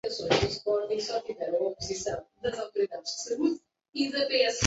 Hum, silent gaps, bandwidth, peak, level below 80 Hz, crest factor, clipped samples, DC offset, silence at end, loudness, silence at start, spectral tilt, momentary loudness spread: none; 3.89-3.93 s; 8.2 kHz; -6 dBFS; -56 dBFS; 24 dB; under 0.1%; under 0.1%; 0 s; -30 LUFS; 0.05 s; -3.5 dB/octave; 8 LU